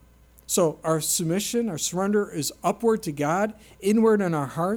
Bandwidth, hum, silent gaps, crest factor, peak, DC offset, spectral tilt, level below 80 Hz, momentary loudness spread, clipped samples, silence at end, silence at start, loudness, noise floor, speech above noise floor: 19.5 kHz; none; none; 14 dB; -10 dBFS; under 0.1%; -4.5 dB/octave; -58 dBFS; 6 LU; under 0.1%; 0 s; 0.5 s; -24 LUFS; -50 dBFS; 26 dB